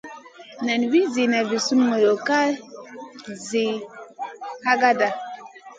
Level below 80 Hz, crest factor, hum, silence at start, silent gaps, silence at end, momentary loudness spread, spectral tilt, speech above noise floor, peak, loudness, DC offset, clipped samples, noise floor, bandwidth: -74 dBFS; 18 dB; none; 0.05 s; none; 0.05 s; 21 LU; -3.5 dB/octave; 22 dB; -4 dBFS; -21 LUFS; under 0.1%; under 0.1%; -42 dBFS; 9.2 kHz